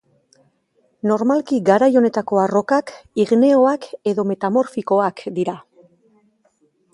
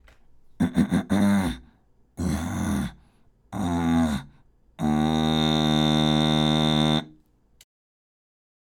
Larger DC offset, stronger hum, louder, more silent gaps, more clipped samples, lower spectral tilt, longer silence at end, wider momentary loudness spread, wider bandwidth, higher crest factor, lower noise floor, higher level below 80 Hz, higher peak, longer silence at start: neither; neither; first, -18 LUFS vs -24 LUFS; neither; neither; first, -7 dB/octave vs -5.5 dB/octave; second, 1.35 s vs 1.55 s; about the same, 10 LU vs 10 LU; second, 11 kHz vs 17.5 kHz; about the same, 18 dB vs 16 dB; first, -63 dBFS vs -59 dBFS; second, -66 dBFS vs -42 dBFS; first, 0 dBFS vs -8 dBFS; first, 1.05 s vs 0.6 s